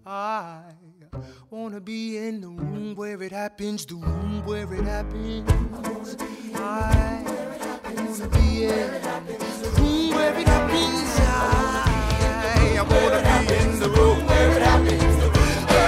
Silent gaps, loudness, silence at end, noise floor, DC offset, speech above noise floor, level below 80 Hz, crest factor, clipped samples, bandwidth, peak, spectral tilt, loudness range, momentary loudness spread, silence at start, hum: none; -22 LUFS; 0 s; -49 dBFS; under 0.1%; 27 dB; -26 dBFS; 16 dB; under 0.1%; 15.5 kHz; -6 dBFS; -5.5 dB/octave; 12 LU; 14 LU; 0.05 s; none